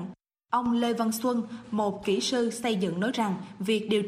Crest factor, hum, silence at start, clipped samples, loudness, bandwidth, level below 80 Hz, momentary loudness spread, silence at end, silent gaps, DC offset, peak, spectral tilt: 16 dB; none; 0 s; under 0.1%; -28 LUFS; 15.5 kHz; -66 dBFS; 5 LU; 0 s; none; under 0.1%; -12 dBFS; -5 dB/octave